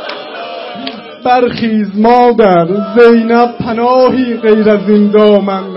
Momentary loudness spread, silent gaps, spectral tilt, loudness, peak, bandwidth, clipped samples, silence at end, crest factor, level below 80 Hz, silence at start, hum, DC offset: 16 LU; none; -8.5 dB/octave; -9 LUFS; 0 dBFS; 5.8 kHz; 0.3%; 0 s; 10 dB; -46 dBFS; 0 s; none; under 0.1%